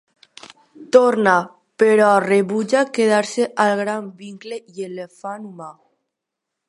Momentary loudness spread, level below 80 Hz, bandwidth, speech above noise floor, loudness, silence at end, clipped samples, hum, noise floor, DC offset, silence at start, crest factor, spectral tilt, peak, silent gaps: 20 LU; -74 dBFS; 11.5 kHz; 64 dB; -17 LUFS; 1 s; under 0.1%; none; -81 dBFS; under 0.1%; 0.8 s; 18 dB; -5 dB/octave; 0 dBFS; none